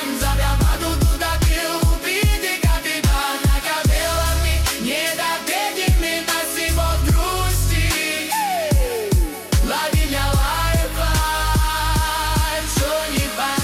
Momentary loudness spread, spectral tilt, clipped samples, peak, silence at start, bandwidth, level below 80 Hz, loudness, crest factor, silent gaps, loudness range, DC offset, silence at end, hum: 2 LU; -4 dB/octave; under 0.1%; -6 dBFS; 0 s; 16.5 kHz; -22 dBFS; -19 LUFS; 12 dB; none; 1 LU; under 0.1%; 0 s; none